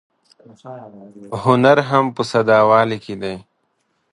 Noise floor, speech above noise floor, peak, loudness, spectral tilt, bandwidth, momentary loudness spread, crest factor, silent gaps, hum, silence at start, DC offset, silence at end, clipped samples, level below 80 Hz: -67 dBFS; 51 dB; 0 dBFS; -16 LUFS; -6.5 dB/octave; 11.5 kHz; 24 LU; 18 dB; none; none; 0.65 s; under 0.1%; 0.75 s; under 0.1%; -58 dBFS